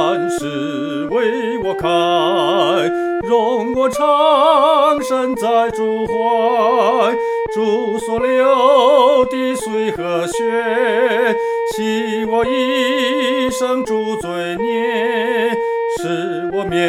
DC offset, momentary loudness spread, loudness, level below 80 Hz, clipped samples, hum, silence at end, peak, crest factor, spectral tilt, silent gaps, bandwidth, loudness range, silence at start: under 0.1%; 8 LU; -16 LUFS; -50 dBFS; under 0.1%; none; 0 s; 0 dBFS; 14 dB; -4.5 dB/octave; none; 15.5 kHz; 3 LU; 0 s